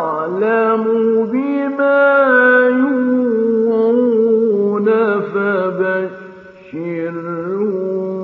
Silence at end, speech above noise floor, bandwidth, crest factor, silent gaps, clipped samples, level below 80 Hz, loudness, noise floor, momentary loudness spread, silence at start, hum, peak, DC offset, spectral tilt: 0 s; 23 dB; 4.6 kHz; 14 dB; none; under 0.1%; -68 dBFS; -15 LUFS; -37 dBFS; 12 LU; 0 s; none; -2 dBFS; under 0.1%; -9 dB/octave